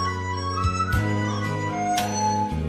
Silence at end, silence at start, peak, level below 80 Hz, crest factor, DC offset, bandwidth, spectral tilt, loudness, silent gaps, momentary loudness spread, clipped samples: 0 s; 0 s; -10 dBFS; -38 dBFS; 14 dB; under 0.1%; 15.5 kHz; -5 dB/octave; -25 LUFS; none; 3 LU; under 0.1%